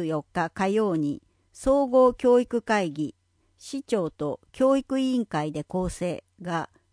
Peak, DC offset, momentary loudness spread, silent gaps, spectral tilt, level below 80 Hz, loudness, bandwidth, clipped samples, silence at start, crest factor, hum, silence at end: -8 dBFS; under 0.1%; 13 LU; none; -6 dB/octave; -50 dBFS; -25 LUFS; 10.5 kHz; under 0.1%; 0 s; 16 dB; none; 0.25 s